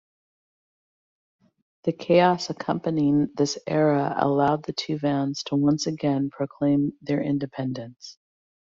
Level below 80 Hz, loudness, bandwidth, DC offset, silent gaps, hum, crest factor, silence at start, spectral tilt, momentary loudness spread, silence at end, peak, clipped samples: -64 dBFS; -24 LUFS; 7.6 kHz; under 0.1%; none; none; 20 dB; 1.85 s; -6 dB/octave; 9 LU; 0.65 s; -6 dBFS; under 0.1%